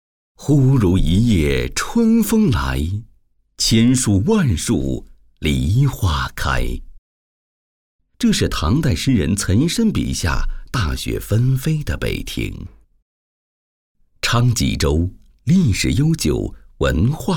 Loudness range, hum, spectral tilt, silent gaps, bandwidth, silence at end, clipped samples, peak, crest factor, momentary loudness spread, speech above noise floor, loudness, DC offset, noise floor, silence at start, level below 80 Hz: 6 LU; none; -5.5 dB/octave; 6.98-7.99 s, 13.02-13.95 s; 19 kHz; 0 s; under 0.1%; -2 dBFS; 16 dB; 11 LU; 38 dB; -18 LUFS; 0.4%; -55 dBFS; 0.4 s; -28 dBFS